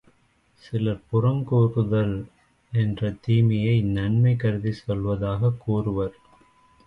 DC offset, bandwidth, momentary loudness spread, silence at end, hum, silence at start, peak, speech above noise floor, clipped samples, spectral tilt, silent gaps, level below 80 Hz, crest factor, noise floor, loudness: under 0.1%; 5.4 kHz; 8 LU; 0.75 s; none; 0.65 s; -10 dBFS; 41 dB; under 0.1%; -10 dB/octave; none; -46 dBFS; 14 dB; -63 dBFS; -24 LUFS